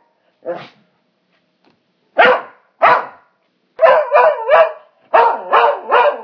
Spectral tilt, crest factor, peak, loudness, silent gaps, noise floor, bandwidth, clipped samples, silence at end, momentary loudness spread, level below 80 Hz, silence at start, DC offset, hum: -4.5 dB/octave; 16 dB; 0 dBFS; -13 LUFS; none; -62 dBFS; 5.4 kHz; under 0.1%; 0 s; 17 LU; -68 dBFS; 0.45 s; under 0.1%; none